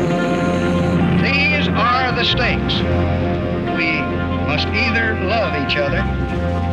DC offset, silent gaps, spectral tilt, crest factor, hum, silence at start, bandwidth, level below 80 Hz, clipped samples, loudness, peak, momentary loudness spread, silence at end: under 0.1%; none; -6.5 dB/octave; 10 dB; none; 0 s; 9 kHz; -32 dBFS; under 0.1%; -17 LUFS; -6 dBFS; 5 LU; 0 s